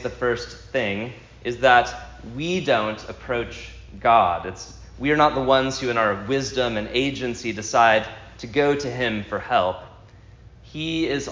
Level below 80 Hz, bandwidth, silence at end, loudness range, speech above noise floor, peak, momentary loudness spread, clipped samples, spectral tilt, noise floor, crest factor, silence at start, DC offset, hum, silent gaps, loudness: -46 dBFS; 7.6 kHz; 0 s; 3 LU; 24 dB; -2 dBFS; 17 LU; under 0.1%; -4.5 dB/octave; -47 dBFS; 20 dB; 0 s; under 0.1%; none; none; -22 LUFS